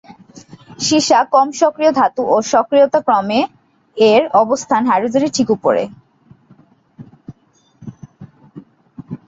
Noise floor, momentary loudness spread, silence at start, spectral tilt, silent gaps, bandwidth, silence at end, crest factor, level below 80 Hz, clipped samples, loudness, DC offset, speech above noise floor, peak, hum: -56 dBFS; 10 LU; 0.1 s; -4 dB/octave; none; 8 kHz; 0.1 s; 14 dB; -60 dBFS; under 0.1%; -14 LUFS; under 0.1%; 42 dB; -2 dBFS; none